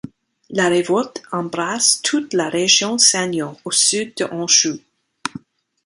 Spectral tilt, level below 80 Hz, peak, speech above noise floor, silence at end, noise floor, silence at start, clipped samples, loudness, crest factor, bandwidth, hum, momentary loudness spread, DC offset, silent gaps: -1.5 dB/octave; -64 dBFS; 0 dBFS; 21 dB; 0.45 s; -39 dBFS; 0.05 s; under 0.1%; -16 LUFS; 20 dB; 11.5 kHz; none; 13 LU; under 0.1%; none